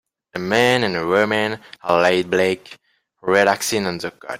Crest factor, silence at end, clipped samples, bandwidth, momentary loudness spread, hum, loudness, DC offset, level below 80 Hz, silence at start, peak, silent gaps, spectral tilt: 18 dB; 0 s; under 0.1%; 16 kHz; 13 LU; none; -19 LUFS; under 0.1%; -58 dBFS; 0.35 s; -2 dBFS; none; -4 dB/octave